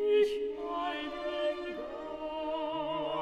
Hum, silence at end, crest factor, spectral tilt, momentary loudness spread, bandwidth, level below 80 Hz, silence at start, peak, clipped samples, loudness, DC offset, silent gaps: none; 0 s; 16 dB; -5 dB/octave; 10 LU; 9.4 kHz; -62 dBFS; 0 s; -18 dBFS; under 0.1%; -34 LUFS; under 0.1%; none